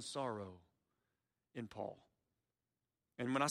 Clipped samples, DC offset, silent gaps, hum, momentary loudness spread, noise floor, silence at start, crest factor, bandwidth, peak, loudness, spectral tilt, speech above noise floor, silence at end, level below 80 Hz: under 0.1%; under 0.1%; none; none; 20 LU; under -90 dBFS; 0 s; 22 dB; 13.5 kHz; -22 dBFS; -45 LUFS; -4.5 dB/octave; over 48 dB; 0 s; -82 dBFS